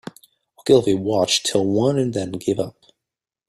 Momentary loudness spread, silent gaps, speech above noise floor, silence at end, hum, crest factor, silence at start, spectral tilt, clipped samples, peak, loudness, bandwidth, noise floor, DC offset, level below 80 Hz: 12 LU; none; 68 dB; 0.8 s; none; 20 dB; 0.65 s; -4.5 dB/octave; under 0.1%; -2 dBFS; -20 LUFS; 14.5 kHz; -86 dBFS; under 0.1%; -58 dBFS